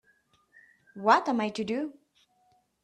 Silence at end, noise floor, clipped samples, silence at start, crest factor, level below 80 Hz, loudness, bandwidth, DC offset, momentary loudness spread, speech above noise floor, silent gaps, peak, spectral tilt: 0.9 s; -69 dBFS; under 0.1%; 0.95 s; 24 dB; -76 dBFS; -28 LUFS; 10 kHz; under 0.1%; 10 LU; 42 dB; none; -8 dBFS; -5 dB/octave